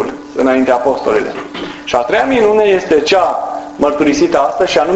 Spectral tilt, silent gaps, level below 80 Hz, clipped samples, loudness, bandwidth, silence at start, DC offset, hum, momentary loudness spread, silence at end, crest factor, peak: -4.5 dB/octave; none; -44 dBFS; under 0.1%; -12 LUFS; 8.2 kHz; 0 s; under 0.1%; none; 11 LU; 0 s; 12 dB; 0 dBFS